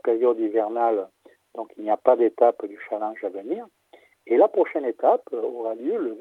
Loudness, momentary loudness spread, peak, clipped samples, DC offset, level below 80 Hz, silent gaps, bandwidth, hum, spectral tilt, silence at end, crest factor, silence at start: -23 LUFS; 13 LU; -2 dBFS; under 0.1%; under 0.1%; -84 dBFS; none; 4 kHz; none; -7 dB/octave; 0 s; 22 dB; 0.05 s